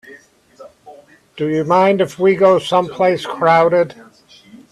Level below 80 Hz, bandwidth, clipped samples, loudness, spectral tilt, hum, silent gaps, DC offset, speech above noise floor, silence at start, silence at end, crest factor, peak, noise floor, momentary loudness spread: -60 dBFS; 12.5 kHz; under 0.1%; -15 LUFS; -6 dB/octave; none; none; under 0.1%; 30 dB; 0.05 s; 0.15 s; 16 dB; 0 dBFS; -44 dBFS; 8 LU